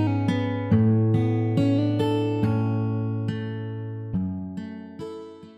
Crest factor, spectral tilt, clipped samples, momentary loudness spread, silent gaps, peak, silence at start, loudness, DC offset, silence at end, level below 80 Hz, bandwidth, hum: 14 dB; -9 dB/octave; under 0.1%; 16 LU; none; -10 dBFS; 0 s; -24 LUFS; under 0.1%; 0.05 s; -54 dBFS; 7.8 kHz; none